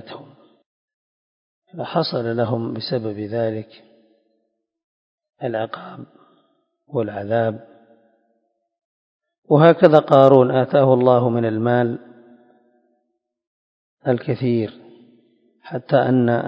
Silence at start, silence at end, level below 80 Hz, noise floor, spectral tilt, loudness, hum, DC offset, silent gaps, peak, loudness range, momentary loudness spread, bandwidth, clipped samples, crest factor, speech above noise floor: 0.05 s; 0 s; -64 dBFS; -73 dBFS; -9.5 dB/octave; -18 LUFS; none; under 0.1%; 0.66-0.88 s, 0.94-1.62 s, 4.84-5.18 s, 8.85-9.20 s, 9.38-9.42 s, 13.47-13.97 s; 0 dBFS; 14 LU; 20 LU; 5.8 kHz; under 0.1%; 20 dB; 56 dB